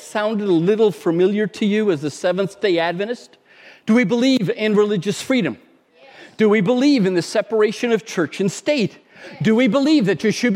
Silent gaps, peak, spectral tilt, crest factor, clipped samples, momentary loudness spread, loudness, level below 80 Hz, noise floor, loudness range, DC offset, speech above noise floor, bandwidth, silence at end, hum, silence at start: none; -4 dBFS; -5.5 dB/octave; 14 dB; under 0.1%; 7 LU; -18 LUFS; -70 dBFS; -48 dBFS; 1 LU; under 0.1%; 31 dB; 15 kHz; 0 s; none; 0 s